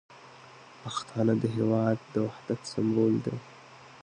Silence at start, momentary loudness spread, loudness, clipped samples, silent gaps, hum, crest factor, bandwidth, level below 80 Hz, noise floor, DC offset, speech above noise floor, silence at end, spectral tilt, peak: 0.1 s; 24 LU; -29 LUFS; under 0.1%; none; none; 16 dB; 9.8 kHz; -66 dBFS; -51 dBFS; under 0.1%; 23 dB; 0.05 s; -7 dB/octave; -14 dBFS